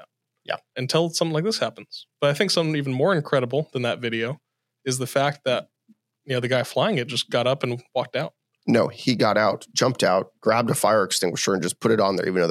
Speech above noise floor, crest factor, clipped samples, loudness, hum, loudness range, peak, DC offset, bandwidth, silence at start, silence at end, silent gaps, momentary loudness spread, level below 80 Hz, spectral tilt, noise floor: 39 dB; 20 dB; under 0.1%; -23 LUFS; none; 4 LU; -4 dBFS; under 0.1%; 16 kHz; 0 s; 0 s; none; 9 LU; -76 dBFS; -4.5 dB/octave; -61 dBFS